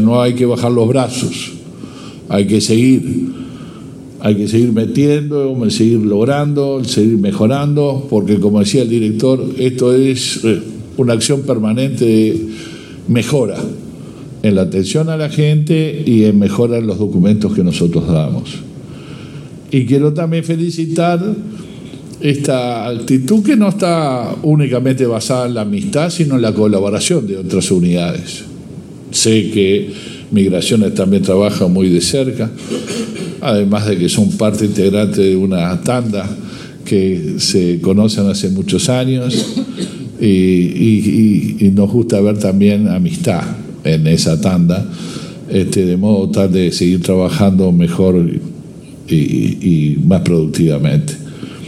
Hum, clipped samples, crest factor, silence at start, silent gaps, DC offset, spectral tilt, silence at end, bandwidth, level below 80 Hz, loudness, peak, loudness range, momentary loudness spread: none; under 0.1%; 12 dB; 0 s; none; under 0.1%; -6 dB/octave; 0 s; 14 kHz; -46 dBFS; -13 LUFS; 0 dBFS; 3 LU; 14 LU